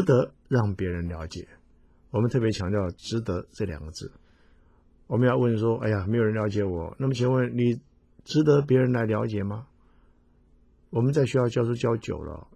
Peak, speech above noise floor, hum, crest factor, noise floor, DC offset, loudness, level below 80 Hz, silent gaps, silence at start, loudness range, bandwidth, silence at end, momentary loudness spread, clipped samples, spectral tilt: -8 dBFS; 35 dB; none; 18 dB; -59 dBFS; under 0.1%; -26 LUFS; -46 dBFS; none; 0 s; 5 LU; 9.8 kHz; 0.15 s; 12 LU; under 0.1%; -7.5 dB/octave